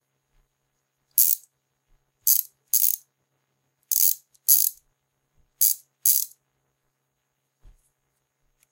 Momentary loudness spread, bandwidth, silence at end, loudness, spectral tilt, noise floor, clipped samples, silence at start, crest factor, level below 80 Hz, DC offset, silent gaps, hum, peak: 8 LU; 18 kHz; 2.45 s; -20 LUFS; 5 dB/octave; -77 dBFS; under 0.1%; 1.15 s; 26 dB; -68 dBFS; under 0.1%; none; none; 0 dBFS